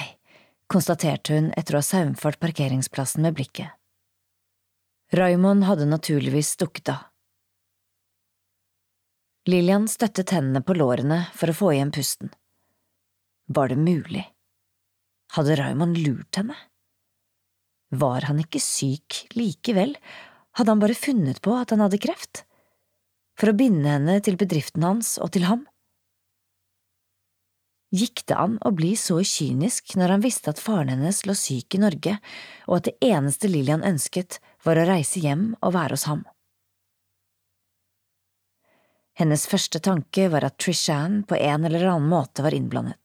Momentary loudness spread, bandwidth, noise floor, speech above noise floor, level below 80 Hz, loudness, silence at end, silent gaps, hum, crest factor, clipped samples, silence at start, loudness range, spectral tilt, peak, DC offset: 10 LU; 17 kHz; -77 dBFS; 54 dB; -68 dBFS; -23 LUFS; 0.1 s; none; none; 16 dB; under 0.1%; 0 s; 5 LU; -5.5 dB/octave; -8 dBFS; under 0.1%